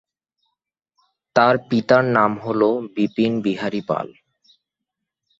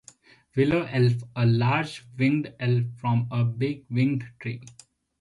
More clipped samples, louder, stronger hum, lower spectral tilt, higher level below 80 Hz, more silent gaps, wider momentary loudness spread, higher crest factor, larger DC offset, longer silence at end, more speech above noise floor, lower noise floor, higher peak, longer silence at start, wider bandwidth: neither; first, -19 LUFS vs -26 LUFS; neither; about the same, -7 dB/octave vs -8 dB/octave; about the same, -62 dBFS vs -58 dBFS; neither; about the same, 9 LU vs 11 LU; first, 20 dB vs 14 dB; neither; first, 1.3 s vs 0.5 s; first, 64 dB vs 30 dB; first, -82 dBFS vs -54 dBFS; first, -2 dBFS vs -10 dBFS; first, 1.35 s vs 0.55 s; second, 7.8 kHz vs 11 kHz